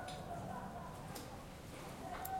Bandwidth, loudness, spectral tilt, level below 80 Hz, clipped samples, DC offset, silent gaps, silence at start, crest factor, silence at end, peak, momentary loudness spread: 16.5 kHz; -48 LUFS; -5 dB/octave; -60 dBFS; under 0.1%; under 0.1%; none; 0 s; 20 dB; 0 s; -26 dBFS; 5 LU